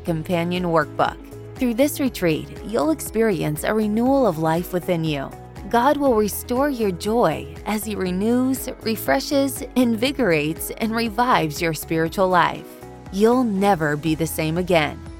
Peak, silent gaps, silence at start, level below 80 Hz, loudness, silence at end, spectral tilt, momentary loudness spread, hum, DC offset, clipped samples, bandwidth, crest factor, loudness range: -2 dBFS; none; 0 s; -42 dBFS; -21 LUFS; 0 s; -5.5 dB/octave; 7 LU; none; under 0.1%; under 0.1%; 17 kHz; 18 dB; 2 LU